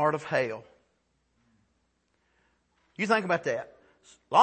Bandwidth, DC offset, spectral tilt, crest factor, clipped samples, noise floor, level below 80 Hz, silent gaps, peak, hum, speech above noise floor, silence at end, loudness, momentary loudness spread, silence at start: 8.8 kHz; under 0.1%; -5 dB/octave; 24 dB; under 0.1%; -74 dBFS; -74 dBFS; none; -6 dBFS; none; 47 dB; 0 s; -28 LUFS; 19 LU; 0 s